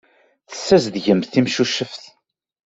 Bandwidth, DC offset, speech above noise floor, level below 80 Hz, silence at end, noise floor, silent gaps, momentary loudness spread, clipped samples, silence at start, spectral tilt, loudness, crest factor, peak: 8 kHz; under 0.1%; 29 dB; -58 dBFS; 0.7 s; -46 dBFS; none; 15 LU; under 0.1%; 0.5 s; -5 dB/octave; -18 LUFS; 18 dB; -2 dBFS